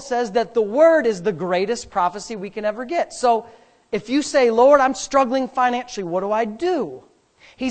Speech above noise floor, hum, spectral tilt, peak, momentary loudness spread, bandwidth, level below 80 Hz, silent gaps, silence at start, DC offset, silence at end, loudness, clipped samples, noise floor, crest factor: 33 dB; none; -4.5 dB/octave; 0 dBFS; 11 LU; 9 kHz; -56 dBFS; none; 0 s; under 0.1%; 0 s; -20 LUFS; under 0.1%; -52 dBFS; 20 dB